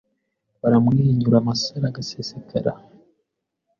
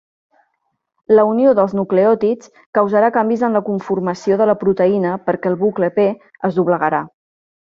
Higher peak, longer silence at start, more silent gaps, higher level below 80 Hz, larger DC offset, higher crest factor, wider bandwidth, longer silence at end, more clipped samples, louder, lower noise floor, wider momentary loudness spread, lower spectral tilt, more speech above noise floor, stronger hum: about the same, -4 dBFS vs -2 dBFS; second, 0.65 s vs 1.1 s; second, none vs 2.66-2.73 s; first, -54 dBFS vs -60 dBFS; neither; about the same, 18 dB vs 14 dB; about the same, 7.2 kHz vs 7.4 kHz; first, 1 s vs 0.7 s; neither; second, -21 LUFS vs -16 LUFS; first, -77 dBFS vs -71 dBFS; first, 13 LU vs 7 LU; about the same, -7 dB/octave vs -8 dB/octave; about the same, 57 dB vs 56 dB; neither